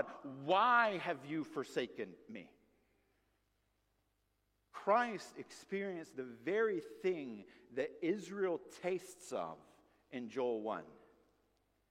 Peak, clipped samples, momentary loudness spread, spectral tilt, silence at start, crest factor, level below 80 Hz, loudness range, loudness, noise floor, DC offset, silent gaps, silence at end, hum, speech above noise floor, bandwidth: -18 dBFS; under 0.1%; 17 LU; -5 dB/octave; 0 s; 22 dB; -82 dBFS; 8 LU; -39 LUFS; -81 dBFS; under 0.1%; none; 0.95 s; none; 42 dB; 15 kHz